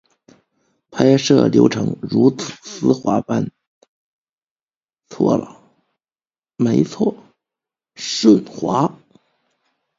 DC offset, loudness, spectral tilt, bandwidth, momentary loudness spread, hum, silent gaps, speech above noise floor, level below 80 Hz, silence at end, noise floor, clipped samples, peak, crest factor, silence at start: under 0.1%; -17 LUFS; -6 dB/octave; 7.8 kHz; 13 LU; none; 3.67-3.81 s, 3.88-4.25 s, 4.32-4.38 s, 4.44-4.56 s, 4.63-4.68 s, 4.76-4.81 s; over 74 dB; -58 dBFS; 1.05 s; under -90 dBFS; under 0.1%; 0 dBFS; 20 dB; 0.9 s